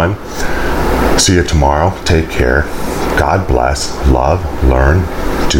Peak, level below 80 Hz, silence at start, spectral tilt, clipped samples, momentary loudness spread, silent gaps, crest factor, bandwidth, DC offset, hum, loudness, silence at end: 0 dBFS; -18 dBFS; 0 s; -5 dB/octave; under 0.1%; 7 LU; none; 12 dB; 17 kHz; under 0.1%; none; -13 LUFS; 0 s